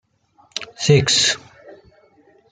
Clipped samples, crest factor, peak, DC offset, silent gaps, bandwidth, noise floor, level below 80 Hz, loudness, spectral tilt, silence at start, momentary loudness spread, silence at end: under 0.1%; 18 dB; -2 dBFS; under 0.1%; none; 9.6 kHz; -57 dBFS; -54 dBFS; -16 LUFS; -3.5 dB/octave; 0.55 s; 17 LU; 0.8 s